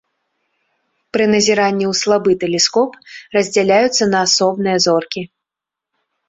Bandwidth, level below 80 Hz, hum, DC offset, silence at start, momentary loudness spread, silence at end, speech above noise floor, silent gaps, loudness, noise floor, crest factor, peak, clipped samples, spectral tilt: 8 kHz; -58 dBFS; none; under 0.1%; 1.15 s; 10 LU; 1 s; 70 dB; none; -15 LUFS; -85 dBFS; 16 dB; -2 dBFS; under 0.1%; -3 dB/octave